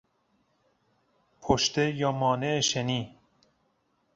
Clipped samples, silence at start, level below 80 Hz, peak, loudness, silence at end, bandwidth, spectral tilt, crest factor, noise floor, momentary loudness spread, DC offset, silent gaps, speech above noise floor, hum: under 0.1%; 1.4 s; -54 dBFS; -8 dBFS; -27 LUFS; 1.05 s; 8 kHz; -4 dB/octave; 22 dB; -72 dBFS; 9 LU; under 0.1%; none; 45 dB; none